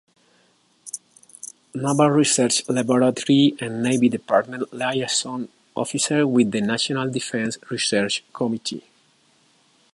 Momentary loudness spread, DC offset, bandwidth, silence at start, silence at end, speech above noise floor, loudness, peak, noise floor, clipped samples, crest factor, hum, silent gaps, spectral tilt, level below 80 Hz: 17 LU; under 0.1%; 11.5 kHz; 0.85 s; 1.15 s; 40 dB; -21 LUFS; -4 dBFS; -61 dBFS; under 0.1%; 18 dB; none; none; -4 dB/octave; -68 dBFS